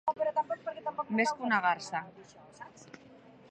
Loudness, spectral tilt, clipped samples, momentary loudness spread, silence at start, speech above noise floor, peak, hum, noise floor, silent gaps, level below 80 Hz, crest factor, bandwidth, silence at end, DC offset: -32 LUFS; -4.5 dB/octave; under 0.1%; 23 LU; 0.05 s; 24 dB; -14 dBFS; none; -56 dBFS; none; -78 dBFS; 20 dB; 11 kHz; 0.35 s; under 0.1%